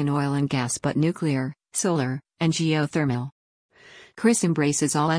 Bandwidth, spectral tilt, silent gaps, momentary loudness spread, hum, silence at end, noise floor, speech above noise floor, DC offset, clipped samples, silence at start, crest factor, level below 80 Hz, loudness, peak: 10.5 kHz; -5 dB/octave; 3.32-3.69 s; 7 LU; none; 0 s; -48 dBFS; 25 dB; under 0.1%; under 0.1%; 0 s; 16 dB; -62 dBFS; -24 LUFS; -8 dBFS